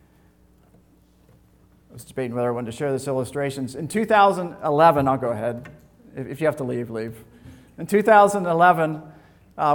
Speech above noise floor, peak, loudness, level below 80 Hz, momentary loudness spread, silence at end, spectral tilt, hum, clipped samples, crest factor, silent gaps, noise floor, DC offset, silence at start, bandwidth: 36 dB; -2 dBFS; -21 LUFS; -58 dBFS; 19 LU; 0 s; -6 dB/octave; none; under 0.1%; 20 dB; none; -56 dBFS; under 0.1%; 1.95 s; 19 kHz